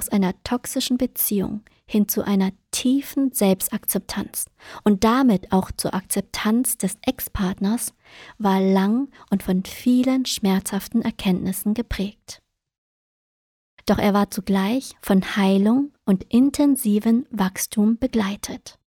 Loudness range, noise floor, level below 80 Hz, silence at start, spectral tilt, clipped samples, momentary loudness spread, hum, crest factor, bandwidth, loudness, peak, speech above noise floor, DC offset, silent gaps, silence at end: 5 LU; under -90 dBFS; -46 dBFS; 0 s; -5 dB/octave; under 0.1%; 8 LU; none; 18 dB; 19 kHz; -22 LUFS; -4 dBFS; over 69 dB; under 0.1%; 12.78-13.77 s; 0.3 s